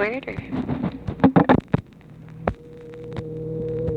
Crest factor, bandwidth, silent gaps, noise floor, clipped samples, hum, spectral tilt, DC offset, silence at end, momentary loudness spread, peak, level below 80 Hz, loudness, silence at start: 22 dB; 5.6 kHz; none; -44 dBFS; under 0.1%; none; -9.5 dB/octave; under 0.1%; 0 s; 22 LU; -2 dBFS; -44 dBFS; -23 LUFS; 0 s